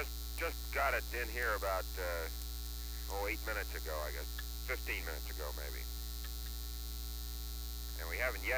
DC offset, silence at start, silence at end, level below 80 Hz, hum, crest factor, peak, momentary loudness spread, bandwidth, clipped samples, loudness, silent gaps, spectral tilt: under 0.1%; 0 s; 0 s; -42 dBFS; none; 18 dB; -20 dBFS; 8 LU; over 20 kHz; under 0.1%; -40 LUFS; none; -3.5 dB/octave